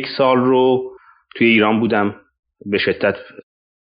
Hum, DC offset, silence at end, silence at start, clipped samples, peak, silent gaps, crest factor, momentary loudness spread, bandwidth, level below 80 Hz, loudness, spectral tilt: none; under 0.1%; 0.7 s; 0 s; under 0.1%; -2 dBFS; 2.39-2.43 s; 16 dB; 17 LU; 5.2 kHz; -60 dBFS; -16 LUFS; -3.5 dB/octave